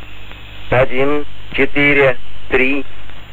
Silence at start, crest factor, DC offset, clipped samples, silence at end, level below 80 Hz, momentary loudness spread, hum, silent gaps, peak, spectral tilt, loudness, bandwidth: 0 s; 14 dB; 20%; under 0.1%; 0 s; -34 dBFS; 23 LU; none; none; -2 dBFS; -7 dB/octave; -15 LUFS; 15 kHz